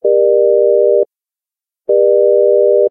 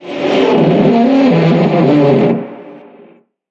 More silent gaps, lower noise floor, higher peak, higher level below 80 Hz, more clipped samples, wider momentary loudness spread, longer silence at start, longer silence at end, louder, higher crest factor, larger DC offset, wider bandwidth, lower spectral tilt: neither; first, -89 dBFS vs -44 dBFS; about the same, -2 dBFS vs 0 dBFS; second, -74 dBFS vs -50 dBFS; neither; about the same, 6 LU vs 6 LU; about the same, 0.05 s vs 0 s; second, 0 s vs 0.7 s; about the same, -11 LUFS vs -10 LUFS; about the same, 10 dB vs 10 dB; neither; second, 1 kHz vs 7.6 kHz; first, -12.5 dB/octave vs -8.5 dB/octave